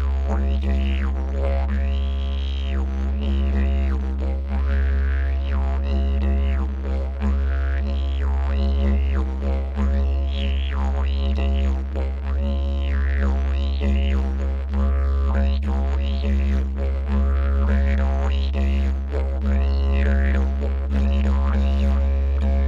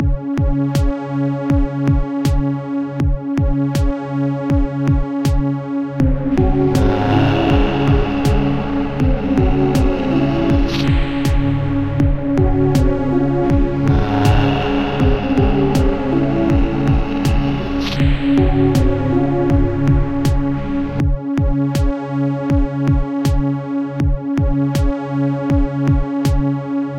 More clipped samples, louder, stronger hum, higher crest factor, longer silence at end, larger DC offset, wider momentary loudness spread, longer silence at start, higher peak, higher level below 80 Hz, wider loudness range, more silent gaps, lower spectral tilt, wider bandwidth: neither; second, -23 LUFS vs -17 LUFS; neither; about the same, 10 dB vs 14 dB; about the same, 0 s vs 0 s; neither; about the same, 4 LU vs 5 LU; about the same, 0 s vs 0 s; second, -10 dBFS vs -2 dBFS; about the same, -20 dBFS vs -22 dBFS; about the same, 2 LU vs 3 LU; neither; about the same, -8.5 dB/octave vs -8 dB/octave; second, 4.6 kHz vs 15.5 kHz